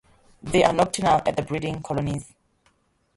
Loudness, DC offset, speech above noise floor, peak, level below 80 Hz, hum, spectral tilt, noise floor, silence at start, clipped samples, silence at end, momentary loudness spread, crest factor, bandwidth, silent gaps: -23 LUFS; under 0.1%; 43 dB; -4 dBFS; -48 dBFS; none; -5 dB/octave; -65 dBFS; 0.45 s; under 0.1%; 0.9 s; 10 LU; 20 dB; 11.5 kHz; none